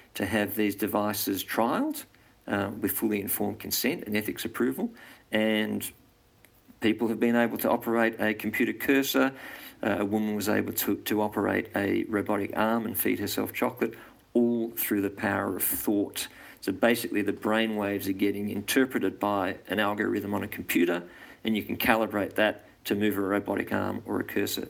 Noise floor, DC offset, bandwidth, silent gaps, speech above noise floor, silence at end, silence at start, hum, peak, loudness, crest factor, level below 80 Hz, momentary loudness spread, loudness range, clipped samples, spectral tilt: -60 dBFS; under 0.1%; 17 kHz; none; 32 dB; 0 s; 0.15 s; none; -6 dBFS; -28 LUFS; 22 dB; -64 dBFS; 7 LU; 2 LU; under 0.1%; -4.5 dB/octave